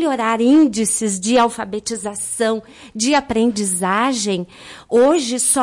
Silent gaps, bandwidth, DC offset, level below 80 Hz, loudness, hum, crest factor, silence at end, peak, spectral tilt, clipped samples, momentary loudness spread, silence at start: none; 11.5 kHz; under 0.1%; -52 dBFS; -17 LUFS; none; 14 dB; 0 s; -4 dBFS; -3 dB/octave; under 0.1%; 11 LU; 0 s